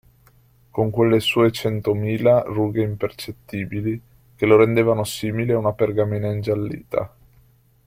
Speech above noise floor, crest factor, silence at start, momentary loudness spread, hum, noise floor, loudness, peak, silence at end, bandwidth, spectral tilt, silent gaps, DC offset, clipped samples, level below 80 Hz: 36 dB; 18 dB; 0.75 s; 11 LU; none; -55 dBFS; -21 LUFS; -2 dBFS; 0.8 s; 16 kHz; -6.5 dB/octave; none; under 0.1%; under 0.1%; -52 dBFS